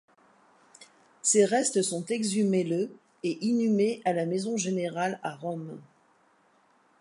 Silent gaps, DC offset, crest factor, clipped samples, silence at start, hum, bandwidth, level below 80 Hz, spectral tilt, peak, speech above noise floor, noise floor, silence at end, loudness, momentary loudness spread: none; under 0.1%; 20 dB; under 0.1%; 0.8 s; none; 11.5 kHz; -80 dBFS; -4.5 dB/octave; -10 dBFS; 38 dB; -65 dBFS; 1.2 s; -28 LUFS; 13 LU